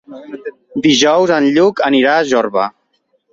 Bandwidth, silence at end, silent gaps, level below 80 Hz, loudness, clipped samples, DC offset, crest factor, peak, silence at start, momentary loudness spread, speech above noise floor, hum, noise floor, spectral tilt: 7.8 kHz; 0.65 s; none; -56 dBFS; -12 LUFS; under 0.1%; under 0.1%; 14 dB; 0 dBFS; 0.1 s; 18 LU; 50 dB; none; -62 dBFS; -4 dB/octave